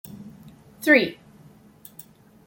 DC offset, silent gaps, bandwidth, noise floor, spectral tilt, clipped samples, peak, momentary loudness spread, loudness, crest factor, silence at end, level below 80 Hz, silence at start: under 0.1%; none; 17 kHz; -51 dBFS; -4.5 dB/octave; under 0.1%; -2 dBFS; 27 LU; -20 LUFS; 24 dB; 1.35 s; -66 dBFS; 0.15 s